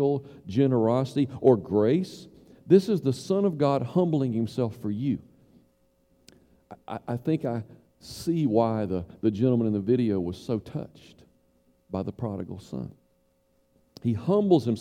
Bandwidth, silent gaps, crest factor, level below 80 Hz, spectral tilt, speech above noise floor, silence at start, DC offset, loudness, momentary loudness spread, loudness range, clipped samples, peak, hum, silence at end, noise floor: 15.5 kHz; none; 20 dB; -60 dBFS; -8.5 dB/octave; 42 dB; 0 s; under 0.1%; -26 LUFS; 15 LU; 11 LU; under 0.1%; -6 dBFS; none; 0 s; -68 dBFS